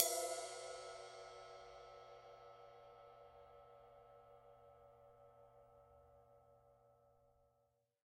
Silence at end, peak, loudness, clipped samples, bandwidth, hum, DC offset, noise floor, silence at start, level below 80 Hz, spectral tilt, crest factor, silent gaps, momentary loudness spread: 0.65 s; -12 dBFS; -49 LUFS; under 0.1%; 15.5 kHz; 60 Hz at -80 dBFS; under 0.1%; -82 dBFS; 0 s; -80 dBFS; -1 dB/octave; 40 dB; none; 20 LU